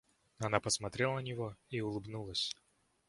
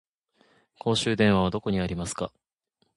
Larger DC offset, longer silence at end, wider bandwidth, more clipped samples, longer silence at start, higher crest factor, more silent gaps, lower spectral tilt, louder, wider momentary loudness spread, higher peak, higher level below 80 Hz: neither; second, 0.55 s vs 0.7 s; about the same, 11.5 kHz vs 11.5 kHz; neither; second, 0.4 s vs 0.85 s; first, 28 dB vs 20 dB; neither; second, -3.5 dB/octave vs -5 dB/octave; second, -37 LUFS vs -26 LUFS; about the same, 9 LU vs 11 LU; second, -12 dBFS vs -8 dBFS; second, -64 dBFS vs -48 dBFS